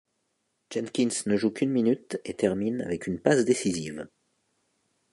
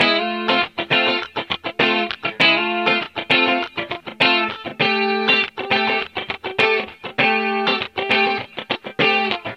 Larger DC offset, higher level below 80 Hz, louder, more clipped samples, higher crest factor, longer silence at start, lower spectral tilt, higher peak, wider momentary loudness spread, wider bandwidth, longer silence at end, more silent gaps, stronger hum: neither; about the same, -62 dBFS vs -60 dBFS; second, -27 LUFS vs -18 LUFS; neither; about the same, 22 dB vs 18 dB; first, 0.7 s vs 0 s; about the same, -5 dB/octave vs -4.5 dB/octave; second, -6 dBFS vs -2 dBFS; about the same, 12 LU vs 10 LU; about the same, 11.5 kHz vs 11.5 kHz; first, 1.05 s vs 0 s; neither; neither